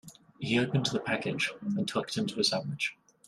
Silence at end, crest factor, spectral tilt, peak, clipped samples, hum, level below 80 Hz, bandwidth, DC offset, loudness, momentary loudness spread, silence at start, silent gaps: 0.35 s; 18 dB; -4.5 dB/octave; -14 dBFS; under 0.1%; none; -68 dBFS; 13.5 kHz; under 0.1%; -31 LUFS; 6 LU; 0.05 s; none